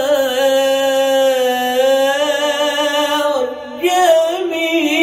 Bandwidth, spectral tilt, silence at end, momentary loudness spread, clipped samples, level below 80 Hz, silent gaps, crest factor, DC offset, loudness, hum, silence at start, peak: 16.5 kHz; -1 dB/octave; 0 s; 5 LU; under 0.1%; -60 dBFS; none; 14 dB; under 0.1%; -15 LUFS; none; 0 s; -2 dBFS